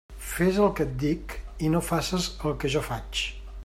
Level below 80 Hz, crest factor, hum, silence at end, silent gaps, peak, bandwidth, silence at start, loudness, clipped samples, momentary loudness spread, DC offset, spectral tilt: -40 dBFS; 16 dB; none; 0.05 s; none; -12 dBFS; 16 kHz; 0.1 s; -27 LUFS; under 0.1%; 9 LU; under 0.1%; -5 dB/octave